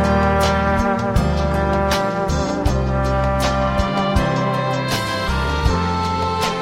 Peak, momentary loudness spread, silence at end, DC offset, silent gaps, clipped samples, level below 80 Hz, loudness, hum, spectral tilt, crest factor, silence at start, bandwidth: -4 dBFS; 4 LU; 0 s; under 0.1%; none; under 0.1%; -26 dBFS; -19 LUFS; none; -6 dB/octave; 14 dB; 0 s; 16 kHz